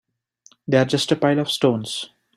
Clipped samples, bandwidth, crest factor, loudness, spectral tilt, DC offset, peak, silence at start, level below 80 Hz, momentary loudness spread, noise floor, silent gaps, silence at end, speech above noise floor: under 0.1%; 15 kHz; 18 dB; -20 LUFS; -5 dB/octave; under 0.1%; -2 dBFS; 0.7 s; -60 dBFS; 11 LU; -56 dBFS; none; 0.3 s; 37 dB